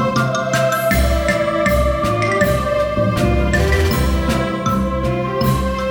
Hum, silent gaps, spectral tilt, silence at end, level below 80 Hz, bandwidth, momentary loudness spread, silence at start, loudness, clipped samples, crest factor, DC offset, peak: none; none; -6 dB/octave; 0 s; -24 dBFS; over 20 kHz; 3 LU; 0 s; -17 LUFS; under 0.1%; 14 dB; under 0.1%; -2 dBFS